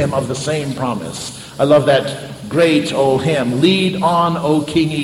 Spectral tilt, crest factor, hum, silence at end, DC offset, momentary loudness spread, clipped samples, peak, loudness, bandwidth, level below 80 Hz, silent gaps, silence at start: -5.5 dB/octave; 16 dB; none; 0 s; under 0.1%; 11 LU; under 0.1%; 0 dBFS; -16 LUFS; 16 kHz; -48 dBFS; none; 0 s